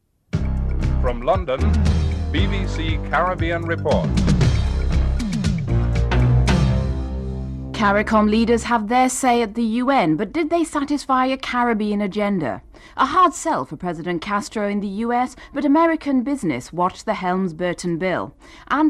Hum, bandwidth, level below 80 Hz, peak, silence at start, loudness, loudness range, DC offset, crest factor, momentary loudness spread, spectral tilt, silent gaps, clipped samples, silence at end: none; 13 kHz; -26 dBFS; -4 dBFS; 0.35 s; -20 LUFS; 3 LU; under 0.1%; 14 dB; 8 LU; -6 dB/octave; none; under 0.1%; 0 s